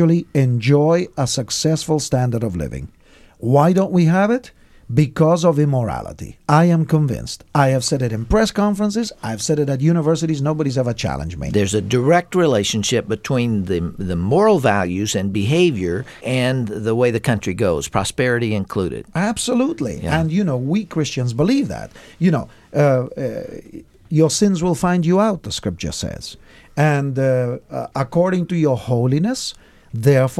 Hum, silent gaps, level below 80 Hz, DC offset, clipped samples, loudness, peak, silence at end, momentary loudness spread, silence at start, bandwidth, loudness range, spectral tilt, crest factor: none; none; -40 dBFS; under 0.1%; under 0.1%; -18 LUFS; 0 dBFS; 0 s; 10 LU; 0 s; 14 kHz; 3 LU; -6 dB/octave; 18 dB